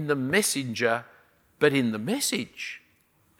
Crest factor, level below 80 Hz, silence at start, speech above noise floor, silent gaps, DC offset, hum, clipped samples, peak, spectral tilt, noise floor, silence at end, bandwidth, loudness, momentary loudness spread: 22 dB; -70 dBFS; 0 s; 39 dB; none; under 0.1%; none; under 0.1%; -6 dBFS; -3.5 dB/octave; -65 dBFS; 0.6 s; 17 kHz; -26 LUFS; 13 LU